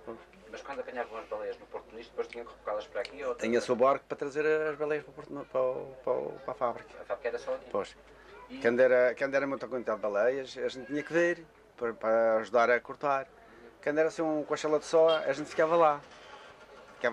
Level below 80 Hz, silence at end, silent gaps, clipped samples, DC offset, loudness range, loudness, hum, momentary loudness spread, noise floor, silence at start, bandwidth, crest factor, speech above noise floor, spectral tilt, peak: -68 dBFS; 0 s; none; under 0.1%; under 0.1%; 6 LU; -31 LUFS; none; 17 LU; -53 dBFS; 0.05 s; 10.5 kHz; 18 dB; 22 dB; -4.5 dB/octave; -12 dBFS